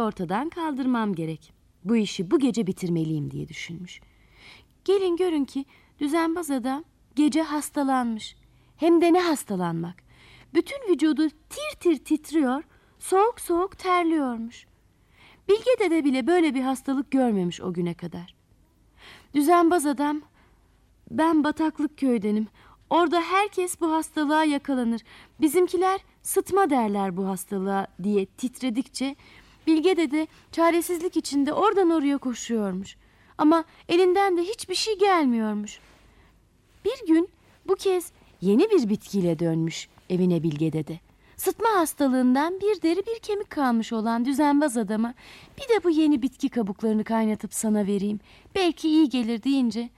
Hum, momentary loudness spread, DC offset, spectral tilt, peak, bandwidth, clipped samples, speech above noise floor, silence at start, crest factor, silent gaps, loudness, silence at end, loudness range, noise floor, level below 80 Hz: none; 12 LU; under 0.1%; -5.5 dB/octave; -10 dBFS; 15 kHz; under 0.1%; 36 dB; 0 s; 14 dB; none; -24 LUFS; 0.1 s; 3 LU; -60 dBFS; -60 dBFS